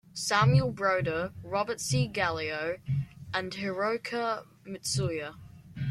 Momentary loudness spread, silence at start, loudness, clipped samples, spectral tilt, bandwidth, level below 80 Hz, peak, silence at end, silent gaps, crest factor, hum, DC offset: 12 LU; 0.15 s; -30 LUFS; under 0.1%; -5 dB/octave; 13 kHz; -56 dBFS; -12 dBFS; 0 s; none; 18 dB; none; under 0.1%